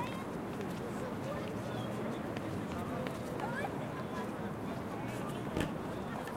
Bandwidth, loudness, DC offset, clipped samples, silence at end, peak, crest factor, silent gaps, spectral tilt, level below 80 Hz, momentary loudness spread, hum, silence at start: 16.5 kHz; -39 LUFS; under 0.1%; under 0.1%; 0 s; -18 dBFS; 20 dB; none; -6.5 dB/octave; -58 dBFS; 3 LU; none; 0 s